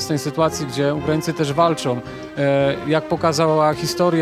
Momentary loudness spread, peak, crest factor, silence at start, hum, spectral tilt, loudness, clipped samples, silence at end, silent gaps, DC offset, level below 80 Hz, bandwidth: 6 LU; -2 dBFS; 16 dB; 0 s; none; -5.5 dB/octave; -19 LUFS; under 0.1%; 0 s; none; under 0.1%; -52 dBFS; 15.5 kHz